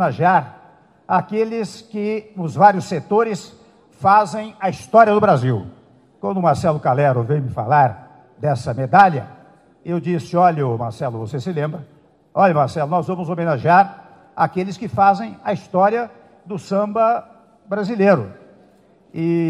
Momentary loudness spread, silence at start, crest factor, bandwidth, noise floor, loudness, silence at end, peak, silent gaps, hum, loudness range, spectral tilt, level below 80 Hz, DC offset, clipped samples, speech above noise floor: 13 LU; 0 s; 18 dB; 11.5 kHz; -52 dBFS; -18 LUFS; 0 s; 0 dBFS; none; none; 3 LU; -7.5 dB/octave; -58 dBFS; under 0.1%; under 0.1%; 35 dB